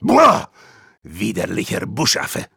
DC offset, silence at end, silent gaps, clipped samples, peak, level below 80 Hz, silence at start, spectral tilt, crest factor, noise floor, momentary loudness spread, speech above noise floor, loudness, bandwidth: under 0.1%; 0.1 s; none; under 0.1%; -2 dBFS; -52 dBFS; 0 s; -4 dB/octave; 16 dB; -48 dBFS; 16 LU; 31 dB; -17 LUFS; over 20 kHz